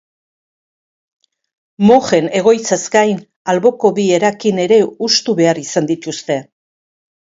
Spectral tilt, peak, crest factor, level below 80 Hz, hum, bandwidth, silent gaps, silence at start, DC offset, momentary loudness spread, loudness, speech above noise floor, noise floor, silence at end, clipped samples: -4.5 dB/octave; 0 dBFS; 16 dB; -60 dBFS; none; 7.8 kHz; 3.36-3.45 s; 1.8 s; under 0.1%; 9 LU; -14 LUFS; over 77 dB; under -90 dBFS; 0.95 s; under 0.1%